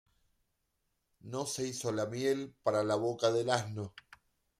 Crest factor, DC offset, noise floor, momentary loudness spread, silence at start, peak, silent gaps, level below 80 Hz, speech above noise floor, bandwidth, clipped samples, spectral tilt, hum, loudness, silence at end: 22 dB; under 0.1%; -81 dBFS; 11 LU; 1.25 s; -14 dBFS; none; -74 dBFS; 47 dB; 15 kHz; under 0.1%; -4.5 dB/octave; none; -34 LUFS; 0.6 s